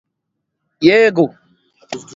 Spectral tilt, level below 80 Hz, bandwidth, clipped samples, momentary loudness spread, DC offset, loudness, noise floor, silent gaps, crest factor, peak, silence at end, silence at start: -5.5 dB/octave; -60 dBFS; 7.8 kHz; under 0.1%; 20 LU; under 0.1%; -13 LUFS; -75 dBFS; none; 16 dB; 0 dBFS; 0.15 s; 0.8 s